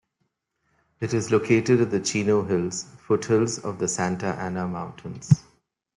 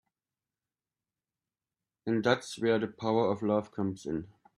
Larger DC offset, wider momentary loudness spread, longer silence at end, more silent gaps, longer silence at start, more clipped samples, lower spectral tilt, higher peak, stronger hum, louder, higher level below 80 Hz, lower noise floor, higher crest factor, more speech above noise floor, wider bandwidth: neither; about the same, 11 LU vs 9 LU; first, 0.55 s vs 0.3 s; neither; second, 1 s vs 2.05 s; neither; about the same, -5.5 dB/octave vs -6 dB/octave; first, -4 dBFS vs -10 dBFS; neither; first, -24 LUFS vs -31 LUFS; first, -60 dBFS vs -68 dBFS; second, -76 dBFS vs under -90 dBFS; about the same, 22 dB vs 22 dB; second, 52 dB vs over 60 dB; about the same, 11.5 kHz vs 11.5 kHz